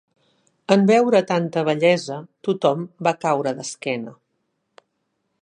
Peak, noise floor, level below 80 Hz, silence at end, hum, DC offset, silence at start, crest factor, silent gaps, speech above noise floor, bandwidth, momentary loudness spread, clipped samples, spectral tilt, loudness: 0 dBFS; -73 dBFS; -72 dBFS; 1.3 s; none; under 0.1%; 0.7 s; 20 dB; none; 54 dB; 10.5 kHz; 13 LU; under 0.1%; -5.5 dB/octave; -20 LUFS